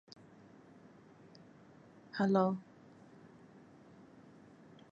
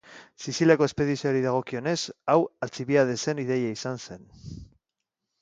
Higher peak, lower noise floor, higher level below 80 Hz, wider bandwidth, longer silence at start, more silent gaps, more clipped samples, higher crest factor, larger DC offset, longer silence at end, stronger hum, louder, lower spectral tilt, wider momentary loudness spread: second, -18 dBFS vs -6 dBFS; second, -60 dBFS vs -85 dBFS; second, -82 dBFS vs -58 dBFS; second, 7.6 kHz vs 9.4 kHz; first, 2.15 s vs 0.1 s; neither; neither; about the same, 24 dB vs 20 dB; neither; first, 2.3 s vs 0.8 s; neither; second, -34 LUFS vs -26 LUFS; first, -8 dB/octave vs -5.5 dB/octave; first, 28 LU vs 21 LU